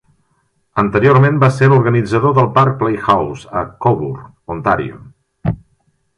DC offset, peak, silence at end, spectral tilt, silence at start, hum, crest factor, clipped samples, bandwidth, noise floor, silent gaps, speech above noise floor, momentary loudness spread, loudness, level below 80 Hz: under 0.1%; 0 dBFS; 0.6 s; -8 dB/octave; 0.75 s; none; 14 dB; under 0.1%; 10 kHz; -62 dBFS; none; 49 dB; 14 LU; -14 LUFS; -42 dBFS